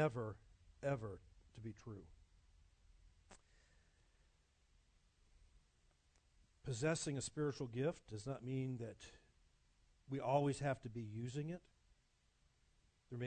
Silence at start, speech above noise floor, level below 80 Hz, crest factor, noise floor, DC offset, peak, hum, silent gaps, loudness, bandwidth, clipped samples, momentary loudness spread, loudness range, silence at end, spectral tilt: 0 s; 35 dB; -70 dBFS; 22 dB; -78 dBFS; under 0.1%; -24 dBFS; none; none; -44 LUFS; 9 kHz; under 0.1%; 16 LU; 16 LU; 0 s; -6 dB/octave